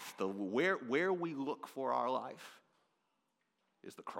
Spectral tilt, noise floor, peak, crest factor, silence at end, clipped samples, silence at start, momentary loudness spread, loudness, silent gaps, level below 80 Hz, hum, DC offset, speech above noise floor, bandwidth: -5.5 dB/octave; -83 dBFS; -22 dBFS; 18 dB; 0 s; under 0.1%; 0 s; 20 LU; -37 LUFS; none; under -90 dBFS; none; under 0.1%; 45 dB; 16.5 kHz